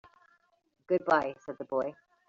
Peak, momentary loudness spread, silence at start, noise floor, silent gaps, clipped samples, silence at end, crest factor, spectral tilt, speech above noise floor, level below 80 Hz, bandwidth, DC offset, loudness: -10 dBFS; 12 LU; 0.9 s; -68 dBFS; none; under 0.1%; 0.35 s; 22 dB; -4 dB/octave; 38 dB; -74 dBFS; 7.6 kHz; under 0.1%; -31 LUFS